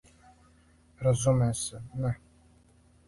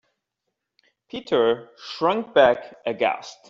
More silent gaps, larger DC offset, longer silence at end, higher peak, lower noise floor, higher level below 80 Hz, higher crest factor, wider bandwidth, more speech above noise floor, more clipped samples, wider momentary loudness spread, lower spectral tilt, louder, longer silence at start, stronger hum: neither; neither; first, 0.9 s vs 0.15 s; second, -12 dBFS vs -4 dBFS; second, -61 dBFS vs -81 dBFS; first, -52 dBFS vs -64 dBFS; about the same, 20 dB vs 20 dB; first, 11.5 kHz vs 7.6 kHz; second, 33 dB vs 59 dB; neither; second, 10 LU vs 17 LU; about the same, -6 dB/octave vs -5 dB/octave; second, -29 LUFS vs -22 LUFS; second, 1 s vs 1.15 s; neither